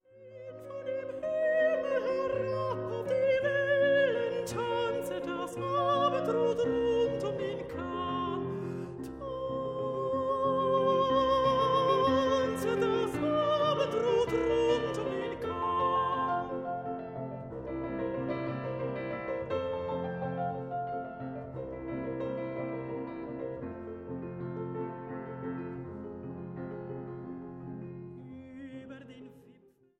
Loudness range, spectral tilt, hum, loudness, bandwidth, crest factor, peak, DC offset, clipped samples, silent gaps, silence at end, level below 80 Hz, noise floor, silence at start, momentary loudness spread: 12 LU; -6 dB/octave; none; -32 LUFS; 14.5 kHz; 16 dB; -16 dBFS; under 0.1%; under 0.1%; none; 0.45 s; -58 dBFS; -62 dBFS; 0.15 s; 15 LU